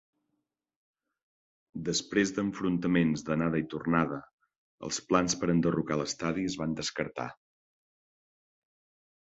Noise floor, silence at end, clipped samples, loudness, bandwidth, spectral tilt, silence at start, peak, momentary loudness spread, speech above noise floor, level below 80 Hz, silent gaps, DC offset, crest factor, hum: -83 dBFS; 1.95 s; under 0.1%; -30 LUFS; 8.2 kHz; -5 dB/octave; 1.75 s; -8 dBFS; 10 LU; 53 dB; -60 dBFS; 4.33-4.38 s, 4.58-4.78 s; under 0.1%; 24 dB; none